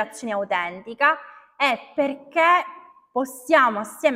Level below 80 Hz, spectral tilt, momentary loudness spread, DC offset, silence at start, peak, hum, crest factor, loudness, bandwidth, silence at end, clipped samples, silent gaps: -74 dBFS; -3 dB/octave; 11 LU; under 0.1%; 0 s; -4 dBFS; none; 18 dB; -22 LUFS; 16 kHz; 0 s; under 0.1%; none